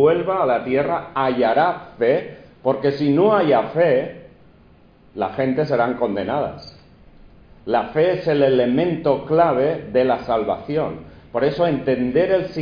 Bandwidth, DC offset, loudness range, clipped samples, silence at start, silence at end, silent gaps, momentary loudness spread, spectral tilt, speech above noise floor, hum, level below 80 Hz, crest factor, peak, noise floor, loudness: 5.2 kHz; under 0.1%; 5 LU; under 0.1%; 0 s; 0 s; none; 9 LU; -8.5 dB/octave; 31 dB; none; -52 dBFS; 16 dB; -4 dBFS; -50 dBFS; -19 LUFS